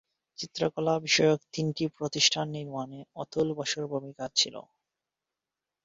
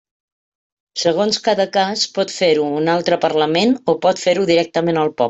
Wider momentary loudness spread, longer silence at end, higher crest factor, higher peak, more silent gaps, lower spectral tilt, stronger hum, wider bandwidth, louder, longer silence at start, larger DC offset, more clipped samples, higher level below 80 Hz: first, 15 LU vs 3 LU; first, 1.25 s vs 0 s; first, 22 dB vs 14 dB; second, -8 dBFS vs -2 dBFS; neither; about the same, -3.5 dB/octave vs -4.5 dB/octave; neither; about the same, 8 kHz vs 8.2 kHz; second, -28 LUFS vs -17 LUFS; second, 0.4 s vs 0.95 s; neither; neither; second, -70 dBFS vs -60 dBFS